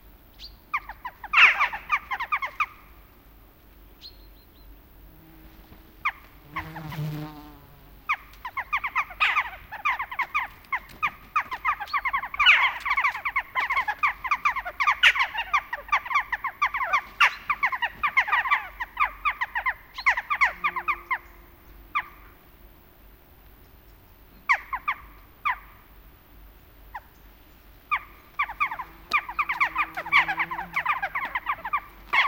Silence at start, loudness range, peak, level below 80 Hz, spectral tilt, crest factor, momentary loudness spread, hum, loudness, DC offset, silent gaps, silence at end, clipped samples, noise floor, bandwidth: 0.05 s; 14 LU; -4 dBFS; -52 dBFS; -2 dB/octave; 24 dB; 16 LU; none; -25 LUFS; under 0.1%; none; 0 s; under 0.1%; -52 dBFS; 17 kHz